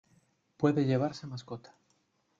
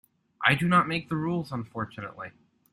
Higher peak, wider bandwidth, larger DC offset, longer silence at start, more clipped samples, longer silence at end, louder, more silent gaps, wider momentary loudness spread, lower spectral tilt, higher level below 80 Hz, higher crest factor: second, -12 dBFS vs -6 dBFS; second, 7.6 kHz vs 12.5 kHz; neither; first, 0.6 s vs 0.4 s; neither; first, 0.8 s vs 0.4 s; second, -31 LUFS vs -27 LUFS; neither; about the same, 17 LU vs 17 LU; first, -8 dB/octave vs -6 dB/octave; second, -72 dBFS vs -62 dBFS; about the same, 22 dB vs 24 dB